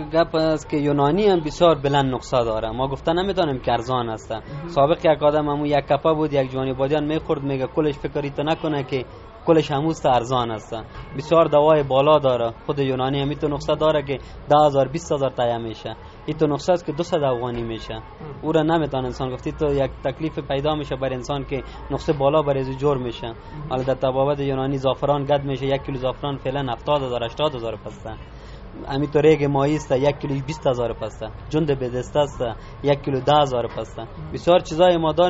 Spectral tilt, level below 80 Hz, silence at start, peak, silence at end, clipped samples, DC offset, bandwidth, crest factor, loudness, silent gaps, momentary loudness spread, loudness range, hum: -5.5 dB/octave; -42 dBFS; 0 s; -2 dBFS; 0 s; under 0.1%; under 0.1%; 8 kHz; 18 dB; -21 LUFS; none; 14 LU; 4 LU; none